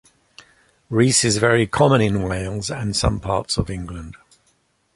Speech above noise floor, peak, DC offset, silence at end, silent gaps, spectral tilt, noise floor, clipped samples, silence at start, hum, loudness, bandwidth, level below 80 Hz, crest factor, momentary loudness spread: 45 dB; -2 dBFS; under 0.1%; 0.8 s; none; -4.5 dB/octave; -64 dBFS; under 0.1%; 0.9 s; none; -19 LUFS; 11.5 kHz; -38 dBFS; 18 dB; 14 LU